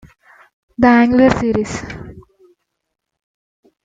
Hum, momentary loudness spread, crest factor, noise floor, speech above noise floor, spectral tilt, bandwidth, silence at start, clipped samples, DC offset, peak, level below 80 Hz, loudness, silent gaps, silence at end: none; 22 LU; 16 dB; -59 dBFS; 46 dB; -6.5 dB/octave; 7.8 kHz; 0.8 s; under 0.1%; under 0.1%; -2 dBFS; -42 dBFS; -13 LUFS; none; 1.65 s